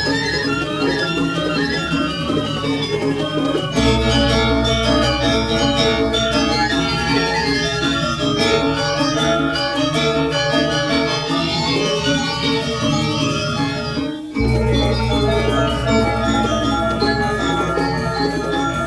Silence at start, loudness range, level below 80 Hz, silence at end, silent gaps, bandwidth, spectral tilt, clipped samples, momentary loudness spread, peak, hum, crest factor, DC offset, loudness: 0 s; 3 LU; -30 dBFS; 0 s; none; 11 kHz; -5 dB/octave; under 0.1%; 4 LU; -2 dBFS; none; 16 dB; under 0.1%; -18 LUFS